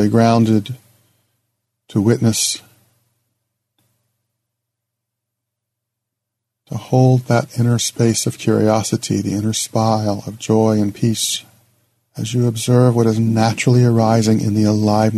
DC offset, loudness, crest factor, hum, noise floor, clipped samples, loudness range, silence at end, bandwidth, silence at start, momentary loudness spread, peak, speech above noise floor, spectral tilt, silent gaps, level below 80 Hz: under 0.1%; -16 LUFS; 16 dB; none; -79 dBFS; under 0.1%; 6 LU; 0 s; 13.5 kHz; 0 s; 10 LU; 0 dBFS; 64 dB; -5.5 dB/octave; none; -56 dBFS